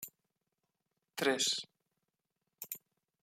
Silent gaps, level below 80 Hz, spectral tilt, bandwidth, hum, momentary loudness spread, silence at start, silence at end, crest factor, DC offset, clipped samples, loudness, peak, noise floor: none; under -90 dBFS; -1 dB/octave; 16 kHz; none; 19 LU; 0 s; 0.45 s; 24 dB; under 0.1%; under 0.1%; -35 LUFS; -18 dBFS; -87 dBFS